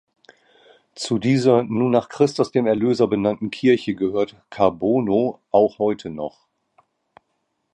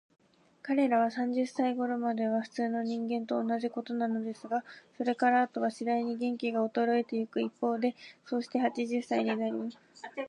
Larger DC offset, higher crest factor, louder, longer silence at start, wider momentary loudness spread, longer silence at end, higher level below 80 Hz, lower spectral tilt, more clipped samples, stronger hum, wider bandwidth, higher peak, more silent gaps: neither; about the same, 18 dB vs 16 dB; first, -20 LUFS vs -31 LUFS; first, 0.95 s vs 0.65 s; about the same, 9 LU vs 8 LU; first, 1.45 s vs 0 s; first, -58 dBFS vs -86 dBFS; about the same, -6.5 dB/octave vs -6 dB/octave; neither; neither; about the same, 10.5 kHz vs 10.5 kHz; first, -2 dBFS vs -16 dBFS; neither